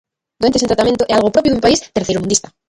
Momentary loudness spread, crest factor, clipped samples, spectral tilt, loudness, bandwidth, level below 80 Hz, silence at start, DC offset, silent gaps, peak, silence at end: 5 LU; 14 dB; under 0.1%; -4 dB/octave; -14 LUFS; 11.5 kHz; -40 dBFS; 0.4 s; under 0.1%; none; 0 dBFS; 0.3 s